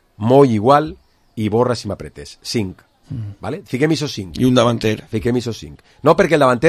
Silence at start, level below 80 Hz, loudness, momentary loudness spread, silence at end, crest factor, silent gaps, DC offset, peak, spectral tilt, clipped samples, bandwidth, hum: 0.2 s; -44 dBFS; -17 LUFS; 17 LU; 0 s; 16 dB; none; under 0.1%; 0 dBFS; -6 dB/octave; under 0.1%; 14 kHz; none